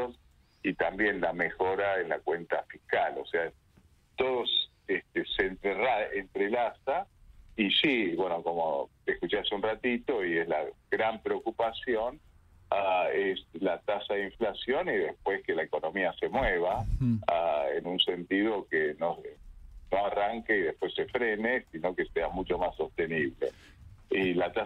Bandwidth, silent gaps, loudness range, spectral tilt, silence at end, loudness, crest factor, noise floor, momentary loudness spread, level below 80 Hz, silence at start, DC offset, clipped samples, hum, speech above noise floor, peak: 9.2 kHz; none; 2 LU; -6.5 dB/octave; 0 s; -30 LUFS; 20 dB; -62 dBFS; 6 LU; -50 dBFS; 0 s; under 0.1%; under 0.1%; none; 32 dB; -12 dBFS